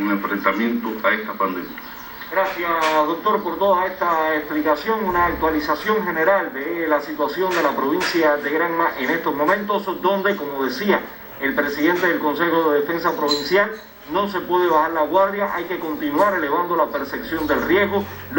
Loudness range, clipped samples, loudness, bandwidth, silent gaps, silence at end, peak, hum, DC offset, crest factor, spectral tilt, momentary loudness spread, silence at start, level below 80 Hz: 1 LU; under 0.1%; -20 LUFS; 16.5 kHz; none; 0 s; -2 dBFS; none; under 0.1%; 18 dB; -5 dB/octave; 6 LU; 0 s; -50 dBFS